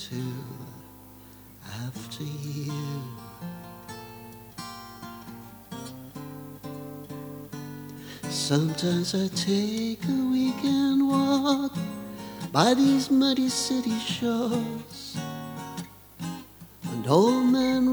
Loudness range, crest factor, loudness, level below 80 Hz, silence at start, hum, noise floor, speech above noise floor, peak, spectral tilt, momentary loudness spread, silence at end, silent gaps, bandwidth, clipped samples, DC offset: 16 LU; 22 dB; -26 LUFS; -62 dBFS; 0 s; 50 Hz at -55 dBFS; -48 dBFS; 24 dB; -4 dBFS; -5 dB/octave; 20 LU; 0 s; none; over 20 kHz; under 0.1%; under 0.1%